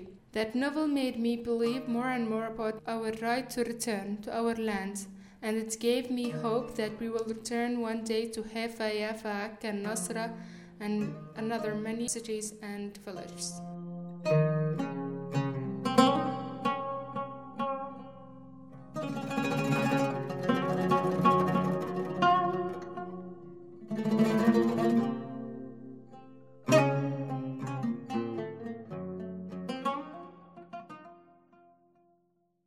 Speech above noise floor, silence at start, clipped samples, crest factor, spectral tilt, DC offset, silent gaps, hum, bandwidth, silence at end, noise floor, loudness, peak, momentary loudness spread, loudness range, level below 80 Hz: 41 dB; 0 s; under 0.1%; 24 dB; -5.5 dB/octave; under 0.1%; none; none; 16 kHz; 1.45 s; -74 dBFS; -32 LUFS; -8 dBFS; 17 LU; 8 LU; -66 dBFS